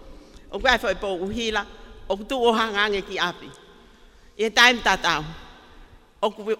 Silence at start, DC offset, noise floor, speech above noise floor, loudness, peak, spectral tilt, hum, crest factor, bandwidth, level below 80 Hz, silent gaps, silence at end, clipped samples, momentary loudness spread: 0 s; under 0.1%; -51 dBFS; 28 dB; -22 LUFS; 0 dBFS; -2.5 dB/octave; none; 24 dB; 16 kHz; -44 dBFS; none; 0.05 s; under 0.1%; 18 LU